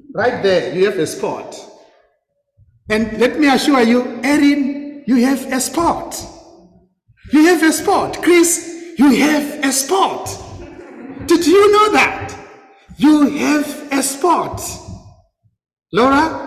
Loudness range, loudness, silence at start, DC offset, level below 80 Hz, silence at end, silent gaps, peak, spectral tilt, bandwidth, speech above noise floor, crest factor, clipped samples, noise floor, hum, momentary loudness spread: 4 LU; -14 LUFS; 0.1 s; under 0.1%; -46 dBFS; 0 s; none; -2 dBFS; -3.5 dB/octave; 16 kHz; 52 dB; 14 dB; under 0.1%; -66 dBFS; none; 17 LU